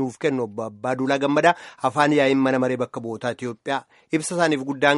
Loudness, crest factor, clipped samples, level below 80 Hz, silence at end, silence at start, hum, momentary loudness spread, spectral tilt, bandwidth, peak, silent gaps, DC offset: -22 LUFS; 20 dB; under 0.1%; -66 dBFS; 0 s; 0 s; none; 10 LU; -5 dB/octave; 11.5 kHz; -2 dBFS; none; under 0.1%